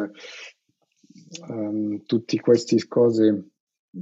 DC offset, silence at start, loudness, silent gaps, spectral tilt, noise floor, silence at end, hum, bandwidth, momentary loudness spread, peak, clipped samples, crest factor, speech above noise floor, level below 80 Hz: under 0.1%; 0 s; -22 LUFS; 3.60-3.67 s, 3.79-3.93 s; -6.5 dB/octave; -65 dBFS; 0 s; none; 8 kHz; 22 LU; -6 dBFS; under 0.1%; 18 dB; 43 dB; -80 dBFS